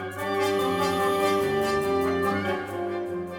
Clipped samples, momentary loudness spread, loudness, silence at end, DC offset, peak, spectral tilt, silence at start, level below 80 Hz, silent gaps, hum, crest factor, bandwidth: under 0.1%; 7 LU; -25 LUFS; 0 s; under 0.1%; -12 dBFS; -5 dB/octave; 0 s; -56 dBFS; none; none; 14 dB; 19.5 kHz